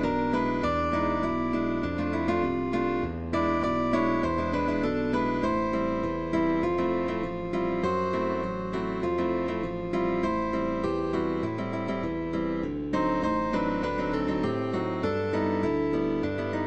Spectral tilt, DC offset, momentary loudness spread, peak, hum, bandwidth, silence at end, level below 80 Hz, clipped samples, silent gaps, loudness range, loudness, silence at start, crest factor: -7.5 dB/octave; 0.5%; 4 LU; -14 dBFS; none; 8.6 kHz; 0 s; -46 dBFS; under 0.1%; none; 2 LU; -28 LUFS; 0 s; 14 dB